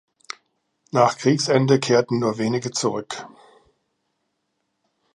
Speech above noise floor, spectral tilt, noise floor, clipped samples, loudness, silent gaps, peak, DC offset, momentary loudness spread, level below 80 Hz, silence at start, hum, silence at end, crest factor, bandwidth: 55 dB; -5 dB/octave; -75 dBFS; under 0.1%; -20 LUFS; none; -2 dBFS; under 0.1%; 20 LU; -68 dBFS; 0.95 s; none; 1.85 s; 22 dB; 11.5 kHz